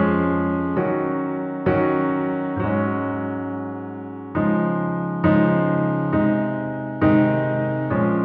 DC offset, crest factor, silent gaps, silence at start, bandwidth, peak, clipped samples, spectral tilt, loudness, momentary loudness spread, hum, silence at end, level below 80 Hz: under 0.1%; 18 dB; none; 0 s; 4.4 kHz; -4 dBFS; under 0.1%; -12 dB/octave; -21 LUFS; 10 LU; none; 0 s; -48 dBFS